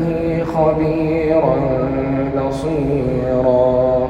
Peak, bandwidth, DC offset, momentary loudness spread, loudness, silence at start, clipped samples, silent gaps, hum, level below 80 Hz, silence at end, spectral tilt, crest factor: -2 dBFS; 10.5 kHz; under 0.1%; 5 LU; -17 LUFS; 0 s; under 0.1%; none; none; -34 dBFS; 0 s; -9 dB/octave; 14 dB